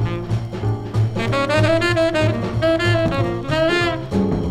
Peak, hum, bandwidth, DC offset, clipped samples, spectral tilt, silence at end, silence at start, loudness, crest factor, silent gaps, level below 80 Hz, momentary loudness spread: -4 dBFS; none; 12 kHz; under 0.1%; under 0.1%; -6.5 dB/octave; 0 s; 0 s; -19 LUFS; 14 dB; none; -36 dBFS; 6 LU